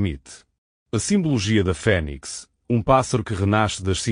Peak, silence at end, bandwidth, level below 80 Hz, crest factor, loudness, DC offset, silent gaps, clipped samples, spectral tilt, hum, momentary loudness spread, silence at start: -4 dBFS; 0 s; 10 kHz; -40 dBFS; 18 dB; -21 LUFS; under 0.1%; 0.58-0.86 s; under 0.1%; -5.5 dB/octave; none; 13 LU; 0 s